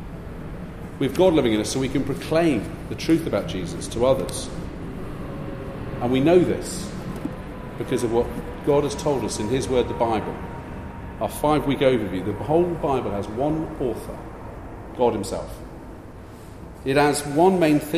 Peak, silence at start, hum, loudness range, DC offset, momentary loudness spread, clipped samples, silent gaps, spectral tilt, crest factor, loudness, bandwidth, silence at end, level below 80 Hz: -6 dBFS; 0 s; none; 4 LU; under 0.1%; 17 LU; under 0.1%; none; -6 dB/octave; 18 dB; -23 LUFS; 15.5 kHz; 0 s; -40 dBFS